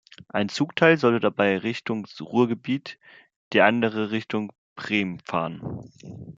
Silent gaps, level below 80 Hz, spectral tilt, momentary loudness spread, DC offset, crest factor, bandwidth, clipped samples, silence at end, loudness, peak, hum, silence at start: 3.36-3.51 s, 4.58-4.76 s; -64 dBFS; -6 dB/octave; 18 LU; under 0.1%; 22 dB; 7.8 kHz; under 0.1%; 0.05 s; -24 LUFS; -2 dBFS; none; 0.35 s